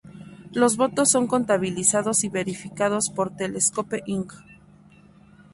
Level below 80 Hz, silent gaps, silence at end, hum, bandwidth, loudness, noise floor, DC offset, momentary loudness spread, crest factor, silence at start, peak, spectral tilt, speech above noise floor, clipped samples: -62 dBFS; none; 1 s; none; 12 kHz; -23 LUFS; -52 dBFS; under 0.1%; 12 LU; 20 dB; 0.05 s; -4 dBFS; -3.5 dB/octave; 28 dB; under 0.1%